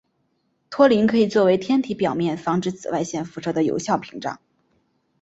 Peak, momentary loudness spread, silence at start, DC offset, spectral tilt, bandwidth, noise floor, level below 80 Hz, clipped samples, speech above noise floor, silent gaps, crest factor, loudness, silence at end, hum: -2 dBFS; 14 LU; 0.7 s; under 0.1%; -6 dB/octave; 8 kHz; -69 dBFS; -60 dBFS; under 0.1%; 49 dB; none; 20 dB; -21 LUFS; 0.85 s; none